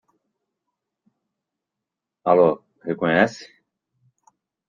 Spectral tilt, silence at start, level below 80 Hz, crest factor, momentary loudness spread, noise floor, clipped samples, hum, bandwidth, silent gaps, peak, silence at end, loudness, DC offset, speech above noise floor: -6.5 dB/octave; 2.25 s; -66 dBFS; 22 dB; 14 LU; -85 dBFS; under 0.1%; none; 7.4 kHz; none; -4 dBFS; 1.25 s; -20 LUFS; under 0.1%; 66 dB